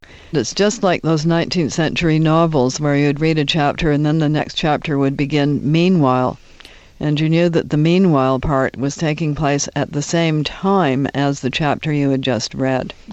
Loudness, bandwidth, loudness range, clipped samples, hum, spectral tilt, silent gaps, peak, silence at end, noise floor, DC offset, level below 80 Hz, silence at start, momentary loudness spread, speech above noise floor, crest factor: -17 LUFS; 8.2 kHz; 2 LU; under 0.1%; none; -6 dB/octave; none; -2 dBFS; 0 s; -42 dBFS; under 0.1%; -40 dBFS; 0.1 s; 6 LU; 26 dB; 16 dB